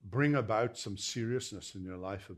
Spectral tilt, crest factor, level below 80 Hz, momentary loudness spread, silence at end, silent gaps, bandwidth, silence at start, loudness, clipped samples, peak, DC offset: -5 dB/octave; 20 dB; -70 dBFS; 12 LU; 0 s; none; 13.5 kHz; 0.05 s; -35 LUFS; under 0.1%; -14 dBFS; under 0.1%